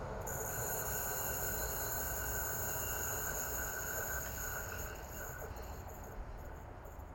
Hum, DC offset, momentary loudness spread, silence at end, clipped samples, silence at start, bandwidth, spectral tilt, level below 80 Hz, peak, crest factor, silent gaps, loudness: none; under 0.1%; 13 LU; 0 s; under 0.1%; 0 s; 16.5 kHz; -3 dB/octave; -50 dBFS; -24 dBFS; 16 dB; none; -39 LUFS